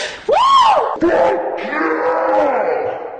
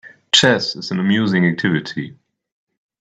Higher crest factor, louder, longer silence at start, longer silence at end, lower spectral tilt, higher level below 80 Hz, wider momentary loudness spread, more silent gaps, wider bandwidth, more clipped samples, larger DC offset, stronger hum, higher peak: second, 12 dB vs 18 dB; about the same, -15 LUFS vs -16 LUFS; about the same, 0 s vs 0.05 s; second, 0 s vs 0.85 s; about the same, -3.5 dB/octave vs -4 dB/octave; first, -50 dBFS vs -60 dBFS; second, 9 LU vs 15 LU; neither; about the same, 9.6 kHz vs 9.2 kHz; neither; neither; neither; second, -4 dBFS vs 0 dBFS